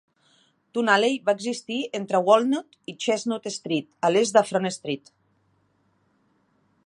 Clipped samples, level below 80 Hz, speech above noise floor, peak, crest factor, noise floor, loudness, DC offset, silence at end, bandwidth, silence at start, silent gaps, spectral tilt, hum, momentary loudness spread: under 0.1%; -78 dBFS; 44 dB; -4 dBFS; 22 dB; -67 dBFS; -24 LUFS; under 0.1%; 1.9 s; 11.5 kHz; 0.75 s; none; -4 dB/octave; none; 12 LU